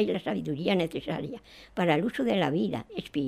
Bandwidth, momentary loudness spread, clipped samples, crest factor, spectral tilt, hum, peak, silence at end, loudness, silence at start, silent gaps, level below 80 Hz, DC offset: 15 kHz; 10 LU; under 0.1%; 18 dB; -7 dB/octave; none; -12 dBFS; 0 s; -29 LUFS; 0 s; none; -60 dBFS; under 0.1%